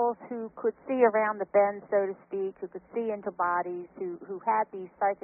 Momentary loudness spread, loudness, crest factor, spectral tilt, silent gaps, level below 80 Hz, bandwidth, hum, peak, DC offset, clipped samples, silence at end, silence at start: 12 LU; -30 LUFS; 20 dB; 0 dB/octave; none; -76 dBFS; 3.1 kHz; none; -10 dBFS; under 0.1%; under 0.1%; 0.1 s; 0 s